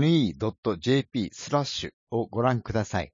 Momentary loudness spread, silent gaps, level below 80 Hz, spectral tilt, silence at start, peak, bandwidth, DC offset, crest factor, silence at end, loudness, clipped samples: 7 LU; 0.58-0.63 s, 1.93-2.07 s; -54 dBFS; -6 dB/octave; 0 s; -10 dBFS; 7.6 kHz; under 0.1%; 16 dB; 0.05 s; -27 LUFS; under 0.1%